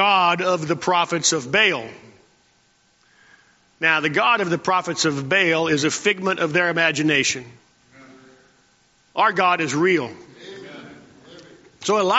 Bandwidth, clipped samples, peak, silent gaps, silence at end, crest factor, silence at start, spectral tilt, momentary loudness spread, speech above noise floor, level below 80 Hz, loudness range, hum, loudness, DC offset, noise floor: 8 kHz; under 0.1%; -2 dBFS; none; 0 s; 20 dB; 0 s; -2 dB/octave; 16 LU; 41 dB; -64 dBFS; 4 LU; none; -19 LUFS; under 0.1%; -61 dBFS